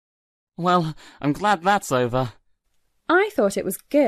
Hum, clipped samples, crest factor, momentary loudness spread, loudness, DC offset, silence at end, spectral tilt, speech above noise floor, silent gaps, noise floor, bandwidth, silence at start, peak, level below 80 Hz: none; under 0.1%; 16 dB; 9 LU; -22 LUFS; under 0.1%; 0 s; -5.5 dB/octave; 46 dB; none; -67 dBFS; 14 kHz; 0.6 s; -6 dBFS; -52 dBFS